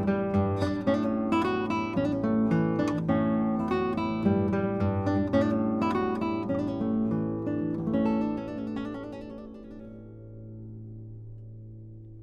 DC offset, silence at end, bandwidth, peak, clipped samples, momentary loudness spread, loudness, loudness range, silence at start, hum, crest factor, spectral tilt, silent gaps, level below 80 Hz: under 0.1%; 0 s; 8.2 kHz; -12 dBFS; under 0.1%; 19 LU; -28 LUFS; 12 LU; 0 s; none; 16 dB; -8.5 dB/octave; none; -54 dBFS